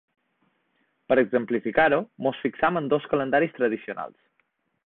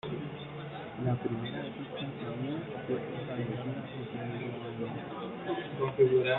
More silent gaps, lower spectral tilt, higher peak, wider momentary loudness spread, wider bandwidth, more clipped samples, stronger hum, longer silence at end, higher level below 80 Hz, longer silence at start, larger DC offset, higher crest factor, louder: neither; about the same, -10 dB/octave vs -10 dB/octave; first, -6 dBFS vs -14 dBFS; about the same, 10 LU vs 8 LU; about the same, 4.3 kHz vs 4.1 kHz; neither; neither; first, 0.75 s vs 0 s; about the same, -62 dBFS vs -66 dBFS; first, 1.1 s vs 0.05 s; neither; about the same, 20 dB vs 20 dB; first, -24 LUFS vs -36 LUFS